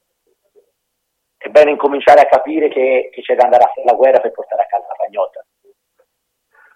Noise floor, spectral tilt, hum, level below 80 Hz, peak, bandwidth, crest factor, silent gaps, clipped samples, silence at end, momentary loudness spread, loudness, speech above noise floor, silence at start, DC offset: -72 dBFS; -4.5 dB/octave; none; -60 dBFS; 0 dBFS; 9.4 kHz; 14 dB; none; under 0.1%; 1.35 s; 12 LU; -13 LUFS; 59 dB; 1.45 s; under 0.1%